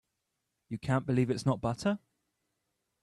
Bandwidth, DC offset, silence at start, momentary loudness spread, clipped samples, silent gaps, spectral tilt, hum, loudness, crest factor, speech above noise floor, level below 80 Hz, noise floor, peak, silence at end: 12 kHz; under 0.1%; 0.7 s; 10 LU; under 0.1%; none; -7 dB/octave; none; -32 LUFS; 18 dB; 53 dB; -62 dBFS; -84 dBFS; -16 dBFS; 1.05 s